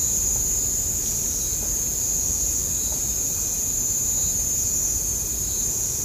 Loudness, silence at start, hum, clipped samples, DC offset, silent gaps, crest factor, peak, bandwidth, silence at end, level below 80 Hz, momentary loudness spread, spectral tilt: -21 LUFS; 0 s; none; under 0.1%; under 0.1%; none; 14 dB; -10 dBFS; 15.5 kHz; 0 s; -38 dBFS; 2 LU; -1.5 dB/octave